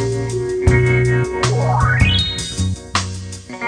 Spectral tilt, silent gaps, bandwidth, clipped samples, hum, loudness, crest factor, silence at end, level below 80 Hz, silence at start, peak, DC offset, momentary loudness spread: -5 dB/octave; none; 10 kHz; under 0.1%; none; -17 LUFS; 16 dB; 0 s; -28 dBFS; 0 s; -2 dBFS; under 0.1%; 8 LU